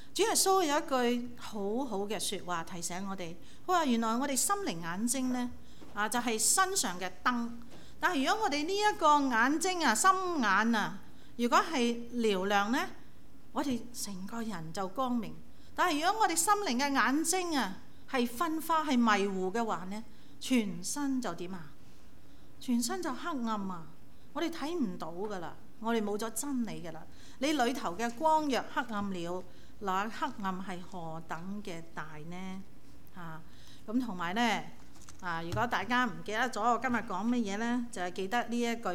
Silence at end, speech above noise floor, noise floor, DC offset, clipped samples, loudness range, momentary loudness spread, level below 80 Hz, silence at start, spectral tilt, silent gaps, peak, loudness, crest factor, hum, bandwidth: 0 s; 26 dB; -58 dBFS; 0.9%; under 0.1%; 9 LU; 16 LU; -62 dBFS; 0 s; -3 dB/octave; none; -14 dBFS; -32 LUFS; 20 dB; none; 17.5 kHz